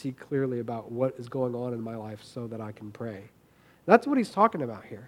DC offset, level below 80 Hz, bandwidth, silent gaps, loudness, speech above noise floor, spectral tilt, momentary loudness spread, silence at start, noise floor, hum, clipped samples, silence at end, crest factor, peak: under 0.1%; -72 dBFS; 15.5 kHz; none; -29 LUFS; 31 dB; -7.5 dB/octave; 17 LU; 0 s; -60 dBFS; none; under 0.1%; 0 s; 28 dB; -2 dBFS